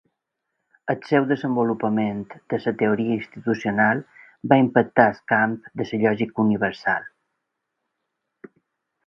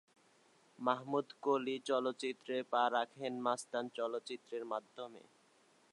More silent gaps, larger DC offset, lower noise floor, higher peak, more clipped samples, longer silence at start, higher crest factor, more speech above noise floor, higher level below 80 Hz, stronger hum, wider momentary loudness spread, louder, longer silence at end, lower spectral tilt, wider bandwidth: neither; neither; first, -80 dBFS vs -70 dBFS; first, 0 dBFS vs -18 dBFS; neither; about the same, 0.85 s vs 0.8 s; about the same, 22 dB vs 22 dB; first, 58 dB vs 32 dB; first, -62 dBFS vs under -90 dBFS; neither; about the same, 10 LU vs 10 LU; first, -22 LUFS vs -38 LUFS; first, 2 s vs 0.75 s; first, -8 dB/octave vs -4 dB/octave; second, 6.8 kHz vs 11.5 kHz